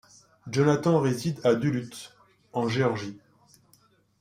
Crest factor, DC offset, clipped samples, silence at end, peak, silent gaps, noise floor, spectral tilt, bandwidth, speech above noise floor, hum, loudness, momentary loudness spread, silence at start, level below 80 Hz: 18 dB; under 0.1%; under 0.1%; 1.05 s; -8 dBFS; none; -63 dBFS; -6.5 dB/octave; 15.5 kHz; 38 dB; none; -26 LUFS; 18 LU; 0.45 s; -64 dBFS